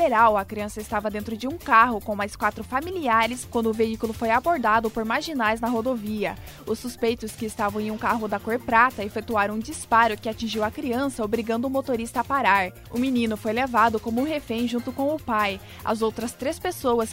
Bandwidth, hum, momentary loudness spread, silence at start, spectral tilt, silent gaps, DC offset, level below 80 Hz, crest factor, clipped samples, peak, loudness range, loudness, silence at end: 16 kHz; none; 9 LU; 0 s; -4.5 dB/octave; none; under 0.1%; -48 dBFS; 20 dB; under 0.1%; -4 dBFS; 2 LU; -24 LUFS; 0 s